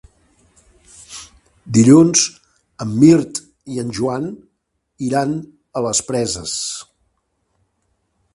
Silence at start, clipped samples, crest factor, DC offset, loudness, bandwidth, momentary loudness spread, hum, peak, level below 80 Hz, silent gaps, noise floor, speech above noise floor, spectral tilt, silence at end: 1.1 s; under 0.1%; 18 dB; under 0.1%; -16 LUFS; 11.5 kHz; 19 LU; none; 0 dBFS; -52 dBFS; none; -71 dBFS; 56 dB; -5 dB/octave; 1.5 s